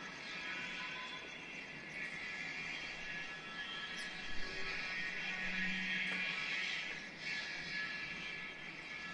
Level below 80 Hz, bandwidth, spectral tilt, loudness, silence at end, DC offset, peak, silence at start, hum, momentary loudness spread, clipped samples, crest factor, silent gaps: -64 dBFS; 11 kHz; -2.5 dB/octave; -41 LUFS; 0 s; under 0.1%; -26 dBFS; 0 s; none; 8 LU; under 0.1%; 18 dB; none